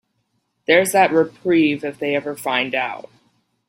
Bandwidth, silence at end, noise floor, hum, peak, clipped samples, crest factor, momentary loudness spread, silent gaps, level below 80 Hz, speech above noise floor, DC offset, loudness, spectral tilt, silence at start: 16 kHz; 0.65 s; -70 dBFS; none; -2 dBFS; under 0.1%; 18 dB; 10 LU; none; -66 dBFS; 52 dB; under 0.1%; -18 LUFS; -4 dB/octave; 0.7 s